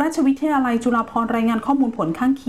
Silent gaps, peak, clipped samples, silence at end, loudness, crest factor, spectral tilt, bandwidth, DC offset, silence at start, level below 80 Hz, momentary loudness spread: none; -8 dBFS; under 0.1%; 0.05 s; -20 LUFS; 10 dB; -6 dB/octave; 13.5 kHz; 0.3%; 0 s; -52 dBFS; 2 LU